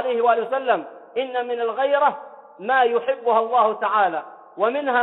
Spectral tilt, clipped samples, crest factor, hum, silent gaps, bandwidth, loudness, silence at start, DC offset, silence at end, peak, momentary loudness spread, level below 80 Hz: -6.5 dB/octave; under 0.1%; 16 dB; none; none; 4.1 kHz; -21 LUFS; 0 s; under 0.1%; 0 s; -4 dBFS; 11 LU; -76 dBFS